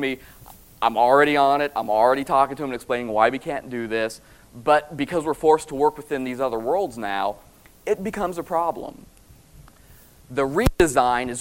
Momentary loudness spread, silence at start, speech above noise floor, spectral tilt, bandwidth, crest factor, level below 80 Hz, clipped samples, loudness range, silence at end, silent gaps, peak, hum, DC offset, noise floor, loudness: 11 LU; 0 s; 29 dB; -5 dB/octave; 16.5 kHz; 22 dB; -40 dBFS; under 0.1%; 8 LU; 0 s; none; -2 dBFS; none; 0.1%; -50 dBFS; -22 LUFS